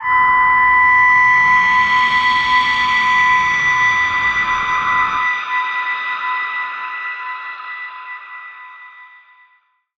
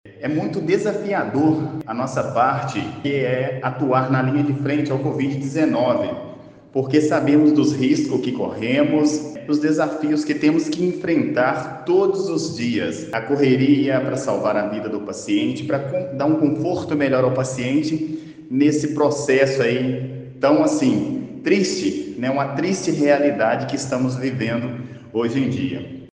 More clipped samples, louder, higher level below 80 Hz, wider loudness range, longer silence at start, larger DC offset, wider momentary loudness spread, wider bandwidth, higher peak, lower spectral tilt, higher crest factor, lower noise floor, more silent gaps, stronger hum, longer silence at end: neither; first, -13 LUFS vs -20 LUFS; first, -48 dBFS vs -60 dBFS; first, 14 LU vs 2 LU; about the same, 0 s vs 0.05 s; neither; first, 17 LU vs 9 LU; second, 8.2 kHz vs 9.6 kHz; about the same, -4 dBFS vs -2 dBFS; second, -1.5 dB/octave vs -6 dB/octave; second, 12 dB vs 18 dB; first, -58 dBFS vs -39 dBFS; neither; neither; first, 0.95 s vs 0.05 s